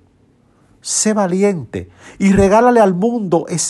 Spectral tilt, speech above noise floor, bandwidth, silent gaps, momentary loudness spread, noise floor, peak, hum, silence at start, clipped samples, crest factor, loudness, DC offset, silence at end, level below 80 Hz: -5 dB/octave; 39 dB; 12 kHz; none; 16 LU; -53 dBFS; -2 dBFS; none; 0.85 s; under 0.1%; 14 dB; -14 LUFS; under 0.1%; 0 s; -40 dBFS